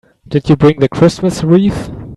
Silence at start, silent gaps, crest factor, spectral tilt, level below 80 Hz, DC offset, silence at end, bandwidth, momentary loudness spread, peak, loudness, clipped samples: 0.3 s; none; 12 dB; -7.5 dB/octave; -36 dBFS; under 0.1%; 0 s; 12 kHz; 8 LU; 0 dBFS; -12 LUFS; under 0.1%